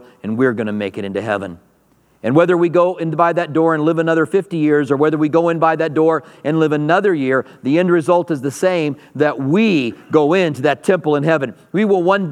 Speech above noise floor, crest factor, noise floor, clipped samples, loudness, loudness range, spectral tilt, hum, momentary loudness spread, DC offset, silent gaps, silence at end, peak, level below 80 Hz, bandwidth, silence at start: 40 dB; 16 dB; -56 dBFS; under 0.1%; -16 LUFS; 2 LU; -7 dB/octave; none; 7 LU; under 0.1%; none; 0 s; 0 dBFS; -66 dBFS; 12.5 kHz; 0.25 s